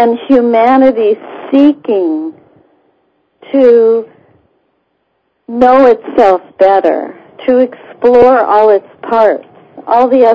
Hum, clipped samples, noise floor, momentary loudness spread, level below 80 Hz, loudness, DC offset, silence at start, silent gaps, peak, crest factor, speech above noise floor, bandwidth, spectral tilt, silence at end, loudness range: none; 2%; -62 dBFS; 12 LU; -48 dBFS; -9 LUFS; under 0.1%; 0 s; none; 0 dBFS; 10 dB; 54 dB; 5.8 kHz; -7 dB/octave; 0 s; 5 LU